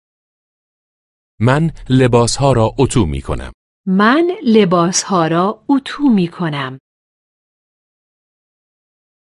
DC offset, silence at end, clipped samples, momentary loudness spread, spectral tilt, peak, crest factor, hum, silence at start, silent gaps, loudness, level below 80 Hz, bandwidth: under 0.1%; 2.5 s; under 0.1%; 12 LU; -5.5 dB/octave; 0 dBFS; 16 dB; none; 1.4 s; 3.54-3.84 s; -14 LUFS; -36 dBFS; 11.5 kHz